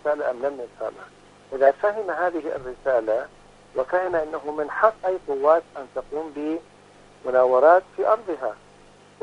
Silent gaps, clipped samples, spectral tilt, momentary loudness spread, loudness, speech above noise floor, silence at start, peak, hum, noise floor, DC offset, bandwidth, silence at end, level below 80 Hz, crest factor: none; under 0.1%; -6 dB/octave; 14 LU; -23 LUFS; 28 dB; 0.05 s; -2 dBFS; 50 Hz at -60 dBFS; -51 dBFS; under 0.1%; 10 kHz; 0.7 s; -58 dBFS; 22 dB